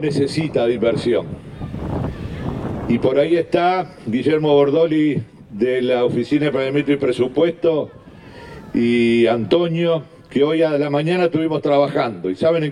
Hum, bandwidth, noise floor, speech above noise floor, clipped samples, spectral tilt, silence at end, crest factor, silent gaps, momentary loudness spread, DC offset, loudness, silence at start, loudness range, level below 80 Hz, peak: none; 10.5 kHz; -39 dBFS; 22 dB; under 0.1%; -7.5 dB/octave; 0 s; 16 dB; none; 11 LU; under 0.1%; -18 LUFS; 0 s; 3 LU; -46 dBFS; -2 dBFS